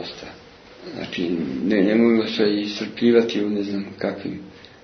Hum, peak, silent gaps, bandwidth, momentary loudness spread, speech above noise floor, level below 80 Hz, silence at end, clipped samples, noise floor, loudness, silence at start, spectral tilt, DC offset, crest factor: none; -4 dBFS; none; 6.4 kHz; 19 LU; 24 dB; -60 dBFS; 0.15 s; under 0.1%; -45 dBFS; -21 LUFS; 0 s; -6.5 dB/octave; under 0.1%; 18 dB